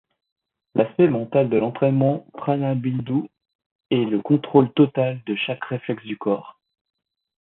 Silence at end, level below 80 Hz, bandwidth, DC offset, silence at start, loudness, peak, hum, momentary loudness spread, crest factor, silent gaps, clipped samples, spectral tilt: 0.9 s; -64 dBFS; 4.1 kHz; under 0.1%; 0.75 s; -22 LUFS; -2 dBFS; none; 9 LU; 20 dB; 3.55-3.59 s, 3.66-3.79 s; under 0.1%; -12 dB/octave